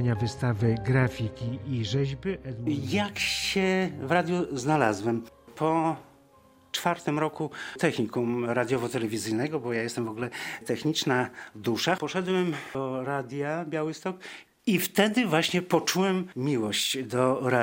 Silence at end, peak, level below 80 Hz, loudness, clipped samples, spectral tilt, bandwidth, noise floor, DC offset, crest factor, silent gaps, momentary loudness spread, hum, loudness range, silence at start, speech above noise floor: 0 s; -6 dBFS; -58 dBFS; -28 LUFS; under 0.1%; -5 dB/octave; 16.5 kHz; -58 dBFS; under 0.1%; 22 dB; none; 9 LU; none; 3 LU; 0 s; 31 dB